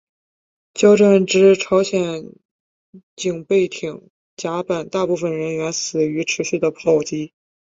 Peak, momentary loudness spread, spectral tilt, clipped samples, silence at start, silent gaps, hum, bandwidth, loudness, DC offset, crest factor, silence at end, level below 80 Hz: -2 dBFS; 16 LU; -5 dB/octave; under 0.1%; 0.75 s; 2.45-2.93 s, 3.03-3.17 s, 4.10-4.37 s; none; 7.8 kHz; -18 LUFS; under 0.1%; 16 dB; 0.5 s; -60 dBFS